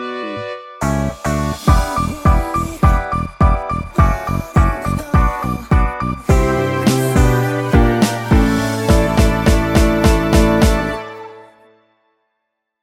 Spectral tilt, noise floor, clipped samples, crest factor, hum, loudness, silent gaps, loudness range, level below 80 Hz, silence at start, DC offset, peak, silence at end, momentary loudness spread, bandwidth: -6.5 dB/octave; -74 dBFS; under 0.1%; 14 dB; none; -16 LUFS; none; 3 LU; -20 dBFS; 0 s; under 0.1%; 0 dBFS; 1.4 s; 9 LU; 16 kHz